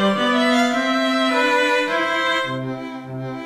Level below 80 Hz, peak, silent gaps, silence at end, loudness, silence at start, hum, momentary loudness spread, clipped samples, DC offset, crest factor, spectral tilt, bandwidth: -60 dBFS; -6 dBFS; none; 0 s; -18 LUFS; 0 s; none; 13 LU; under 0.1%; under 0.1%; 14 dB; -4 dB/octave; 14 kHz